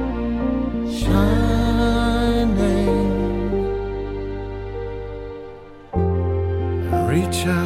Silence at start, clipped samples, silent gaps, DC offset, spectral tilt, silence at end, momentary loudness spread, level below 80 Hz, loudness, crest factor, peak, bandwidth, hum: 0 s; under 0.1%; none; under 0.1%; -7 dB/octave; 0 s; 12 LU; -28 dBFS; -21 LUFS; 14 dB; -6 dBFS; 16 kHz; none